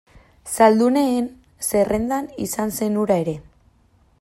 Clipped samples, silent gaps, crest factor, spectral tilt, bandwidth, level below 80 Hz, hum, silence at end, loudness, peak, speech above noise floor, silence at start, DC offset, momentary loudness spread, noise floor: under 0.1%; none; 20 dB; -5 dB/octave; 16 kHz; -50 dBFS; none; 0.8 s; -20 LUFS; -2 dBFS; 39 dB; 0.45 s; under 0.1%; 14 LU; -58 dBFS